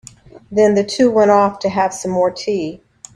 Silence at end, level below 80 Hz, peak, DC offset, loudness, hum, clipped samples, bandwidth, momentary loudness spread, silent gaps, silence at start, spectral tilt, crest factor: 0.4 s; -54 dBFS; 0 dBFS; under 0.1%; -15 LUFS; none; under 0.1%; 11 kHz; 10 LU; none; 0.5 s; -5 dB/octave; 16 dB